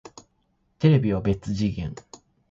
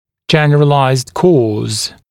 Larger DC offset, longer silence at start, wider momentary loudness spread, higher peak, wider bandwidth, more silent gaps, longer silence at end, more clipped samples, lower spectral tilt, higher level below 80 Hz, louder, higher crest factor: neither; first, 0.8 s vs 0.3 s; first, 15 LU vs 7 LU; second, -4 dBFS vs 0 dBFS; second, 7.6 kHz vs 14 kHz; neither; first, 0.55 s vs 0.2 s; neither; first, -8 dB/octave vs -5.5 dB/octave; about the same, -46 dBFS vs -50 dBFS; second, -24 LUFS vs -12 LUFS; first, 20 dB vs 12 dB